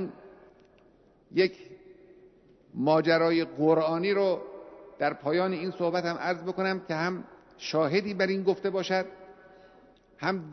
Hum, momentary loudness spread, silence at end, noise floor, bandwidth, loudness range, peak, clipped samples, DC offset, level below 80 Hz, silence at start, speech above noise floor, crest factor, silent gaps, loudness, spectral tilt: none; 15 LU; 0 s; -61 dBFS; 6.4 kHz; 4 LU; -12 dBFS; under 0.1%; under 0.1%; -70 dBFS; 0 s; 33 dB; 18 dB; none; -28 LUFS; -6.5 dB/octave